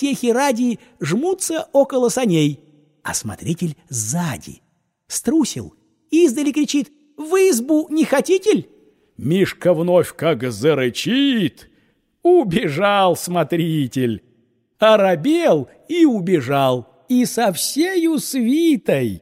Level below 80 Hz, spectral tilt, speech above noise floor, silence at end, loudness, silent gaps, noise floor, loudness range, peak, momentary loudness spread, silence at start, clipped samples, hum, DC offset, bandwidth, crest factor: -58 dBFS; -5 dB/octave; 44 dB; 0.05 s; -18 LUFS; none; -61 dBFS; 4 LU; -2 dBFS; 9 LU; 0 s; under 0.1%; none; under 0.1%; 16 kHz; 16 dB